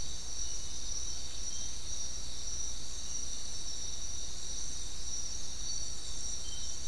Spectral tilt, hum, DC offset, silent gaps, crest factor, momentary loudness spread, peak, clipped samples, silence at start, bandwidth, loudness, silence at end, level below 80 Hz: -1 dB/octave; none; 3%; none; 14 dB; 2 LU; -22 dBFS; under 0.1%; 0 s; 12 kHz; -39 LUFS; 0 s; -48 dBFS